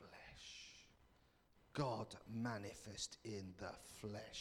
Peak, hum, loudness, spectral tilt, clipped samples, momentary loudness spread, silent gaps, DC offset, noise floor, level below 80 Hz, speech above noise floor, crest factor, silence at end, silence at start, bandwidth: -28 dBFS; none; -49 LUFS; -4.5 dB/octave; under 0.1%; 14 LU; none; under 0.1%; -74 dBFS; -72 dBFS; 26 dB; 22 dB; 0 s; 0 s; 19 kHz